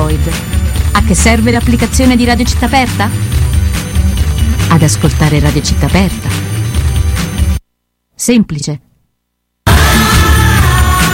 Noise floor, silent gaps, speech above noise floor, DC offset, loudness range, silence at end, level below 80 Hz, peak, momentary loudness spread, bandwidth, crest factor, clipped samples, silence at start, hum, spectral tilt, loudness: -67 dBFS; none; 58 dB; under 0.1%; 4 LU; 0 s; -16 dBFS; 0 dBFS; 8 LU; 17 kHz; 10 dB; under 0.1%; 0 s; none; -5 dB/octave; -11 LUFS